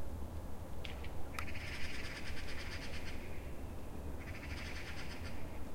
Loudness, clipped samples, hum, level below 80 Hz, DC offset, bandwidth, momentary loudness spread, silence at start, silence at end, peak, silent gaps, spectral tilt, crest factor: -46 LUFS; under 0.1%; none; -48 dBFS; under 0.1%; 16 kHz; 4 LU; 0 s; 0 s; -22 dBFS; none; -5 dB/octave; 16 dB